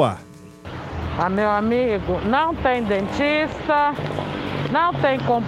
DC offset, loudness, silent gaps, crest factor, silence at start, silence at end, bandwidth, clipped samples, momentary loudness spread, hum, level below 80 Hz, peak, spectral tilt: under 0.1%; -21 LUFS; none; 18 dB; 0 s; 0 s; 14 kHz; under 0.1%; 11 LU; none; -40 dBFS; -2 dBFS; -7 dB/octave